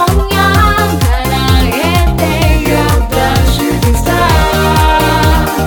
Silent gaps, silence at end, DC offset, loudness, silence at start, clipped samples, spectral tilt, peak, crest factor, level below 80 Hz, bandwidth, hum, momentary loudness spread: none; 0 s; under 0.1%; -10 LUFS; 0 s; under 0.1%; -5 dB/octave; 0 dBFS; 10 dB; -14 dBFS; over 20 kHz; none; 3 LU